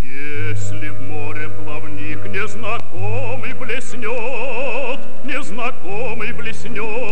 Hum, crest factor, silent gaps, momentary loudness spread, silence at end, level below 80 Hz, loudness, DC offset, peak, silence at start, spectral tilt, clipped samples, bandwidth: none; 16 dB; none; 6 LU; 0 s; -48 dBFS; -26 LUFS; 50%; -2 dBFS; 0 s; -5.5 dB/octave; under 0.1%; 16.5 kHz